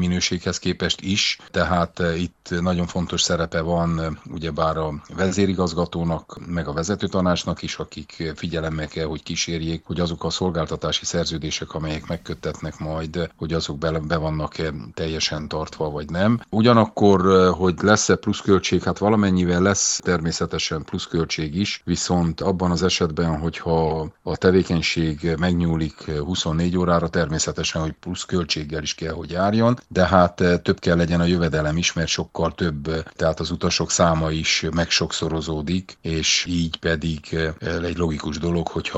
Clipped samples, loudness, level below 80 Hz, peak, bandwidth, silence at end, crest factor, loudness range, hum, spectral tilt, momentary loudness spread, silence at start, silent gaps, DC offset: under 0.1%; -22 LUFS; -40 dBFS; 0 dBFS; 8.2 kHz; 0 s; 22 dB; 7 LU; none; -4.5 dB/octave; 10 LU; 0 s; none; under 0.1%